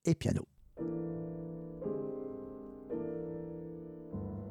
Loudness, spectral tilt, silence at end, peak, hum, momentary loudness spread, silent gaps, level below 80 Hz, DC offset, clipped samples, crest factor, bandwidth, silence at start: -40 LUFS; -7.5 dB/octave; 0 s; -16 dBFS; none; 10 LU; none; -60 dBFS; under 0.1%; under 0.1%; 22 dB; 13 kHz; 0.05 s